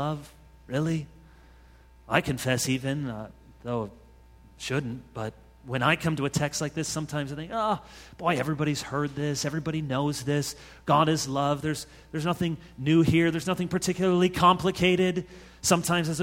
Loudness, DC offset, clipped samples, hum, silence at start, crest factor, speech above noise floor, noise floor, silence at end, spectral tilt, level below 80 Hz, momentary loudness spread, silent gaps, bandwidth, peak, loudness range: -27 LUFS; under 0.1%; under 0.1%; none; 0 s; 22 dB; 27 dB; -54 dBFS; 0 s; -5 dB/octave; -52 dBFS; 14 LU; none; 16.5 kHz; -6 dBFS; 7 LU